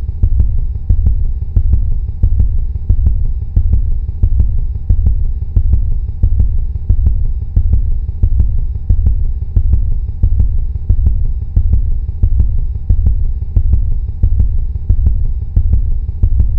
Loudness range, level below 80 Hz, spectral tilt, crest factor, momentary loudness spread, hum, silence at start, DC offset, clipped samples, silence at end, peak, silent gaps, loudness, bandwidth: 1 LU; -12 dBFS; -12.5 dB/octave; 12 dB; 5 LU; none; 0 s; 0.5%; 0.1%; 0 s; 0 dBFS; none; -17 LUFS; 1 kHz